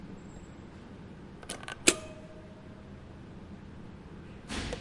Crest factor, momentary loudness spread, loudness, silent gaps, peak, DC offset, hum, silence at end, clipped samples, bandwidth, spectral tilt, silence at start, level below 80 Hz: 34 dB; 22 LU; -31 LUFS; none; -4 dBFS; under 0.1%; none; 0 s; under 0.1%; 11.5 kHz; -2.5 dB/octave; 0 s; -54 dBFS